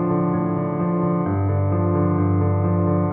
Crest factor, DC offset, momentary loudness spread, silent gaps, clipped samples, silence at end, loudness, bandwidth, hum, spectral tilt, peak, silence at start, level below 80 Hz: 12 dB; under 0.1%; 3 LU; none; under 0.1%; 0 s; -21 LUFS; 2.6 kHz; none; -12 dB/octave; -8 dBFS; 0 s; -52 dBFS